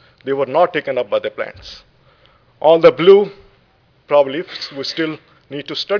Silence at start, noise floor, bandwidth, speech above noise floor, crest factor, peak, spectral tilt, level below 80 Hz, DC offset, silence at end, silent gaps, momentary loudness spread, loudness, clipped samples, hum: 0.25 s; -55 dBFS; 5.4 kHz; 40 dB; 16 dB; 0 dBFS; -6 dB/octave; -58 dBFS; under 0.1%; 0 s; none; 19 LU; -16 LUFS; under 0.1%; none